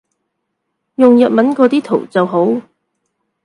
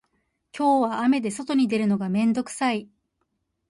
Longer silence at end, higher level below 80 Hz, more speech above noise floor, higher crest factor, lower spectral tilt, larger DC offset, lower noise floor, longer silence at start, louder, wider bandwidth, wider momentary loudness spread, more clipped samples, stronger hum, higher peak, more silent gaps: about the same, 0.85 s vs 0.85 s; about the same, -64 dBFS vs -66 dBFS; first, 61 dB vs 53 dB; about the same, 14 dB vs 14 dB; first, -7.5 dB/octave vs -5.5 dB/octave; neither; about the same, -72 dBFS vs -75 dBFS; first, 1 s vs 0.55 s; first, -12 LUFS vs -23 LUFS; about the same, 10.5 kHz vs 11.5 kHz; first, 8 LU vs 5 LU; neither; neither; first, 0 dBFS vs -10 dBFS; neither